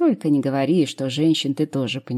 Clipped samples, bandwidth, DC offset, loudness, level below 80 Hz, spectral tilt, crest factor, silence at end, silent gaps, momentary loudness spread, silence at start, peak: under 0.1%; 13 kHz; under 0.1%; -21 LUFS; -70 dBFS; -6 dB/octave; 12 dB; 0 s; none; 4 LU; 0 s; -8 dBFS